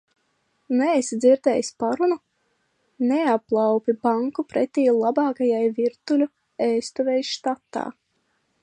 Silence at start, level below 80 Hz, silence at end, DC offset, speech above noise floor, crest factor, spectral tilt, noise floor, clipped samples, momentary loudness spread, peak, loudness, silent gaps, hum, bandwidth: 0.7 s; -72 dBFS; 0.7 s; under 0.1%; 49 dB; 16 dB; -4.5 dB/octave; -70 dBFS; under 0.1%; 8 LU; -6 dBFS; -22 LUFS; none; none; 10 kHz